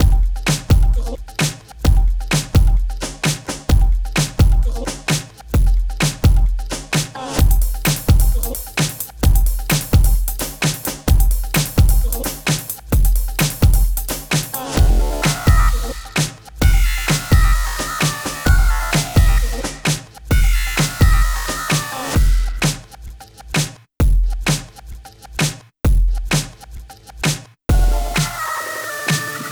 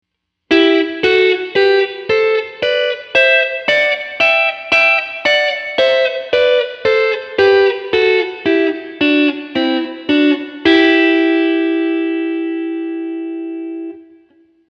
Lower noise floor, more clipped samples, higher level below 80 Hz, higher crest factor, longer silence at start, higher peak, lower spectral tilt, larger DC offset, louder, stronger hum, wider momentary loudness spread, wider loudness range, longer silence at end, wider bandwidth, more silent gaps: second, -35 dBFS vs -52 dBFS; neither; first, -18 dBFS vs -56 dBFS; about the same, 16 dB vs 14 dB; second, 0 s vs 0.5 s; about the same, 0 dBFS vs 0 dBFS; about the same, -4.5 dB/octave vs -4 dB/octave; neither; second, -18 LUFS vs -14 LUFS; neither; about the same, 8 LU vs 10 LU; about the same, 3 LU vs 2 LU; second, 0 s vs 0.7 s; first, over 20 kHz vs 7.8 kHz; neither